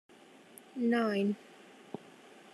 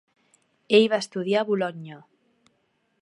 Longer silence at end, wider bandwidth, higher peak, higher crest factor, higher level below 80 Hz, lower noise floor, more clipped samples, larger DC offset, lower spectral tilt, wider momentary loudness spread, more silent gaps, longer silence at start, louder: about the same, 1.15 s vs 1.05 s; first, 12.5 kHz vs 11 kHz; second, -20 dBFS vs -4 dBFS; second, 16 dB vs 22 dB; second, -90 dBFS vs -80 dBFS; second, -56 dBFS vs -71 dBFS; neither; neither; first, -6.5 dB/octave vs -5 dB/octave; first, 25 LU vs 18 LU; neither; about the same, 0.75 s vs 0.7 s; second, -32 LUFS vs -23 LUFS